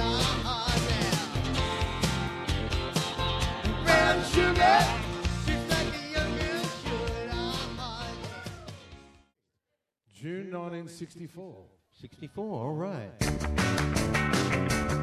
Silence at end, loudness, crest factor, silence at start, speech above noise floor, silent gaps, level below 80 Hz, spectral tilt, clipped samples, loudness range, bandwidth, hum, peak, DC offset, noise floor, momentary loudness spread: 0 s; -28 LUFS; 20 dB; 0 s; 54 dB; none; -38 dBFS; -4.5 dB/octave; under 0.1%; 16 LU; 15.5 kHz; none; -8 dBFS; under 0.1%; -83 dBFS; 19 LU